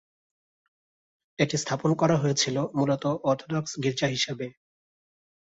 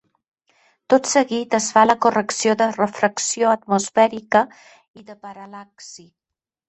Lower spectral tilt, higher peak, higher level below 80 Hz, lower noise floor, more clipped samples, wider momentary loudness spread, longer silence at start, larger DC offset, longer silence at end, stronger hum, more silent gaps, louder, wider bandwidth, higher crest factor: first, -4.5 dB/octave vs -3 dB/octave; second, -8 dBFS vs -2 dBFS; about the same, -64 dBFS vs -66 dBFS; about the same, under -90 dBFS vs -87 dBFS; neither; second, 6 LU vs 23 LU; first, 1.4 s vs 0.9 s; neither; first, 1.05 s vs 0.7 s; neither; second, none vs 4.88-4.94 s; second, -26 LUFS vs -18 LUFS; about the same, 8 kHz vs 8.6 kHz; about the same, 20 dB vs 20 dB